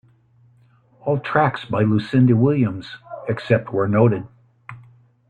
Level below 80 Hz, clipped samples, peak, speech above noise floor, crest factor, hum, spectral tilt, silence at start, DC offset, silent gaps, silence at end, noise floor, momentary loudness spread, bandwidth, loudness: -56 dBFS; under 0.1%; -2 dBFS; 37 dB; 18 dB; none; -9.5 dB/octave; 1.05 s; under 0.1%; none; 0.5 s; -55 dBFS; 18 LU; 4.8 kHz; -19 LUFS